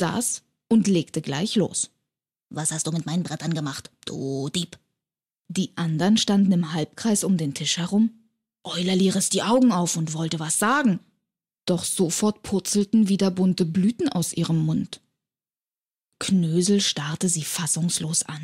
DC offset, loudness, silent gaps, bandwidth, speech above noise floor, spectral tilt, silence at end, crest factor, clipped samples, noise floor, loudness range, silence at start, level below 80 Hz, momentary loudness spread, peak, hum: under 0.1%; -23 LUFS; none; 16 kHz; over 67 dB; -4.5 dB/octave; 0 s; 14 dB; under 0.1%; under -90 dBFS; 5 LU; 0 s; -64 dBFS; 10 LU; -10 dBFS; none